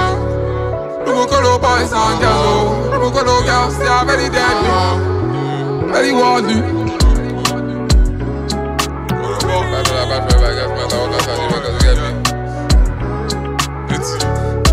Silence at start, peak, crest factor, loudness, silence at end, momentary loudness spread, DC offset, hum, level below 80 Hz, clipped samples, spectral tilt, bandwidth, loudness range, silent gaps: 0 s; 0 dBFS; 14 dB; -15 LUFS; 0 s; 7 LU; under 0.1%; none; -20 dBFS; under 0.1%; -5 dB/octave; 15.5 kHz; 3 LU; none